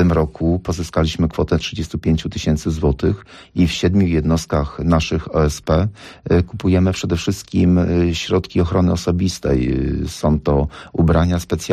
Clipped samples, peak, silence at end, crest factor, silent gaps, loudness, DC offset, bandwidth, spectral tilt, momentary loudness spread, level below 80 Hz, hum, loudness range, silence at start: under 0.1%; -6 dBFS; 0 s; 12 dB; none; -18 LUFS; under 0.1%; 13.5 kHz; -6.5 dB/octave; 6 LU; -28 dBFS; none; 2 LU; 0 s